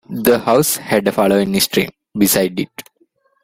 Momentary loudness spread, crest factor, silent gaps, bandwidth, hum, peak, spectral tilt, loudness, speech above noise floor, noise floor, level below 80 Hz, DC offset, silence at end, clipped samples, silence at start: 11 LU; 16 dB; none; 16.5 kHz; none; 0 dBFS; -4 dB/octave; -15 LUFS; 44 dB; -59 dBFS; -50 dBFS; under 0.1%; 0.6 s; under 0.1%; 0.1 s